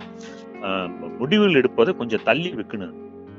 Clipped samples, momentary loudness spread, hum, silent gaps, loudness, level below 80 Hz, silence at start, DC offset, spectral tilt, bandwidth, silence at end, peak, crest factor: under 0.1%; 21 LU; none; none; -21 LUFS; -64 dBFS; 0 s; under 0.1%; -6.5 dB/octave; 7.4 kHz; 0 s; -2 dBFS; 20 dB